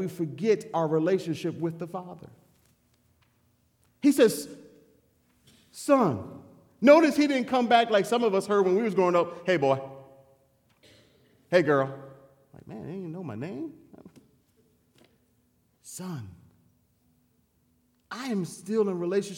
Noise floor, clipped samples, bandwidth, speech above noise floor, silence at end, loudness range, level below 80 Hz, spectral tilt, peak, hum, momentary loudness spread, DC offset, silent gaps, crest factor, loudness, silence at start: -69 dBFS; under 0.1%; 17 kHz; 43 dB; 0 s; 21 LU; -74 dBFS; -5.5 dB/octave; -6 dBFS; none; 20 LU; under 0.1%; none; 22 dB; -25 LUFS; 0 s